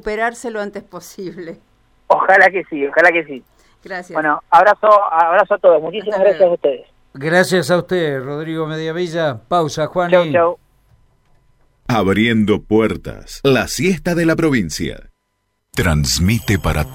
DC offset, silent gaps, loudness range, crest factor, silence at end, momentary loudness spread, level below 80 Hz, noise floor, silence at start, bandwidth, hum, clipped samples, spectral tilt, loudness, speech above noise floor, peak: under 0.1%; none; 5 LU; 16 dB; 0 s; 17 LU; -36 dBFS; -69 dBFS; 0.05 s; 17 kHz; none; under 0.1%; -5 dB/octave; -15 LUFS; 53 dB; 0 dBFS